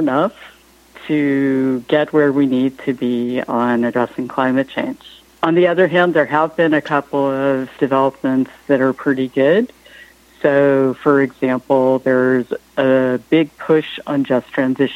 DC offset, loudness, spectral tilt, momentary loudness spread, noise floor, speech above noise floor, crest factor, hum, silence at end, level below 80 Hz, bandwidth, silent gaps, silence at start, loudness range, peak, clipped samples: under 0.1%; -16 LUFS; -7.5 dB/octave; 6 LU; -44 dBFS; 28 dB; 16 dB; none; 0 s; -60 dBFS; 11.5 kHz; none; 0 s; 2 LU; -2 dBFS; under 0.1%